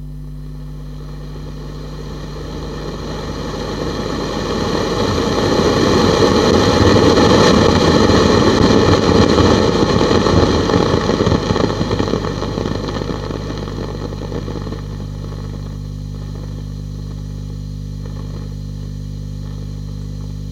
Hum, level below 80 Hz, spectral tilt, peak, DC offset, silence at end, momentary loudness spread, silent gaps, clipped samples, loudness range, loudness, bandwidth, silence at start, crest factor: 50 Hz at -25 dBFS; -28 dBFS; -5.5 dB/octave; 0 dBFS; under 0.1%; 0 s; 17 LU; none; under 0.1%; 16 LU; -15 LUFS; 14.5 kHz; 0 s; 16 dB